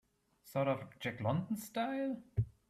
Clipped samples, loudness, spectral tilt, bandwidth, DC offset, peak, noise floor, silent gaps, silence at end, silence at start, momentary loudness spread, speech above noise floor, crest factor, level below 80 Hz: under 0.1%; -38 LUFS; -6.5 dB/octave; 15.5 kHz; under 0.1%; -22 dBFS; -65 dBFS; none; 0.2 s; 0.45 s; 4 LU; 28 dB; 16 dB; -60 dBFS